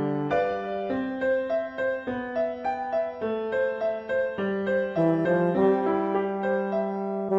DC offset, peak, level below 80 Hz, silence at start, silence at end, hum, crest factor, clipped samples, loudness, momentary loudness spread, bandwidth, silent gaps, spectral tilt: under 0.1%; -10 dBFS; -60 dBFS; 0 s; 0 s; none; 16 dB; under 0.1%; -27 LUFS; 7 LU; 7.4 kHz; none; -8.5 dB/octave